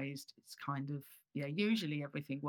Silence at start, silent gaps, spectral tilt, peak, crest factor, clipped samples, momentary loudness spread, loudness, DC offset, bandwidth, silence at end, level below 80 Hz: 0 s; none; -6 dB/octave; -24 dBFS; 16 dB; under 0.1%; 13 LU; -40 LUFS; under 0.1%; over 20 kHz; 0 s; under -90 dBFS